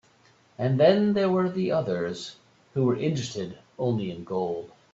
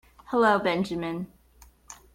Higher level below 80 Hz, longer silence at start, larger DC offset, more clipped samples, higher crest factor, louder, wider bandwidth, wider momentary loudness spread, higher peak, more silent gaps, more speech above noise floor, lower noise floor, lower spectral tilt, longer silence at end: second, -64 dBFS vs -58 dBFS; first, 0.6 s vs 0.3 s; neither; neither; about the same, 20 dB vs 18 dB; about the same, -26 LUFS vs -26 LUFS; second, 8 kHz vs 16.5 kHz; second, 15 LU vs 18 LU; first, -6 dBFS vs -10 dBFS; neither; first, 35 dB vs 31 dB; first, -60 dBFS vs -56 dBFS; first, -7 dB/octave vs -5.5 dB/octave; about the same, 0.25 s vs 0.2 s